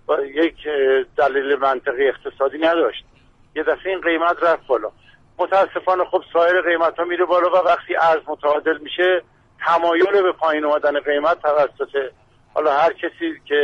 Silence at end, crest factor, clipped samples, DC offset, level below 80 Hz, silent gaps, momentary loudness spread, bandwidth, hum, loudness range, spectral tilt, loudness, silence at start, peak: 0 s; 12 dB; under 0.1%; under 0.1%; -56 dBFS; none; 8 LU; 7.4 kHz; none; 3 LU; -5 dB/octave; -19 LUFS; 0.1 s; -6 dBFS